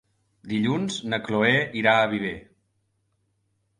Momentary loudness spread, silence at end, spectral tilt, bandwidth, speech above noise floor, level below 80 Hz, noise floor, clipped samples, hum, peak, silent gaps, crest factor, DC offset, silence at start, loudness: 10 LU; 1.4 s; -5 dB/octave; 11.5 kHz; 48 dB; -60 dBFS; -72 dBFS; under 0.1%; none; -6 dBFS; none; 20 dB; under 0.1%; 0.45 s; -23 LUFS